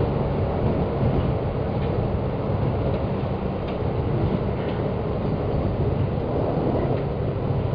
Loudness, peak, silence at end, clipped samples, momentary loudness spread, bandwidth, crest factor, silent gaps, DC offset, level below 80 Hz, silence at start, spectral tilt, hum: -25 LUFS; -10 dBFS; 0 s; under 0.1%; 3 LU; 5.2 kHz; 14 dB; none; under 0.1%; -34 dBFS; 0 s; -11 dB/octave; none